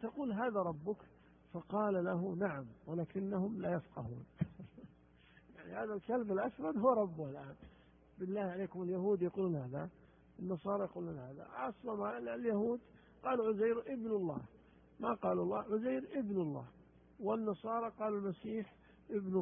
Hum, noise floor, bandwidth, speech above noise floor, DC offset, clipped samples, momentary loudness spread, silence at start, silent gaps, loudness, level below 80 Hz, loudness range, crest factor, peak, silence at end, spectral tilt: none; -65 dBFS; 3.6 kHz; 27 dB; under 0.1%; under 0.1%; 12 LU; 0 s; none; -39 LUFS; -70 dBFS; 4 LU; 20 dB; -18 dBFS; 0 s; -5 dB/octave